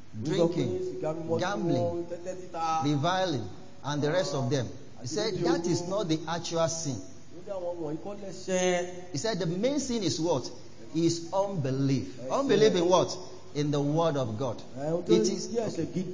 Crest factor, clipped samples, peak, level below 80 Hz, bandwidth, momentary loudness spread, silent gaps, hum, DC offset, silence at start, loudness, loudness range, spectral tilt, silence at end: 20 dB; under 0.1%; -10 dBFS; -62 dBFS; 7.6 kHz; 13 LU; none; none; 0.8%; 0.15 s; -29 LUFS; 4 LU; -5.5 dB/octave; 0 s